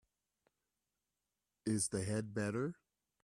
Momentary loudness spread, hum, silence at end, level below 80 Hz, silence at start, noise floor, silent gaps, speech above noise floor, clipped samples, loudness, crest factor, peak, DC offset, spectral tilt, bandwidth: 7 LU; none; 0.5 s; -72 dBFS; 1.65 s; under -90 dBFS; none; over 52 dB; under 0.1%; -39 LUFS; 20 dB; -22 dBFS; under 0.1%; -5 dB/octave; 14.5 kHz